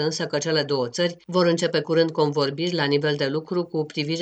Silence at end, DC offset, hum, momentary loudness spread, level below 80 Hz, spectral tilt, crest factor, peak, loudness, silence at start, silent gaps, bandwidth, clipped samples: 0 s; under 0.1%; none; 6 LU; -70 dBFS; -5 dB/octave; 18 dB; -6 dBFS; -23 LUFS; 0 s; none; 9 kHz; under 0.1%